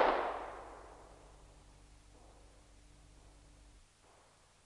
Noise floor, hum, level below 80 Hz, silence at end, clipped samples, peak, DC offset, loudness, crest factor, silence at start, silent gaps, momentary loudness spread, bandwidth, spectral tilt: -66 dBFS; none; -62 dBFS; 0.95 s; under 0.1%; -14 dBFS; under 0.1%; -40 LUFS; 28 dB; 0 s; none; 23 LU; 11.5 kHz; -4.5 dB/octave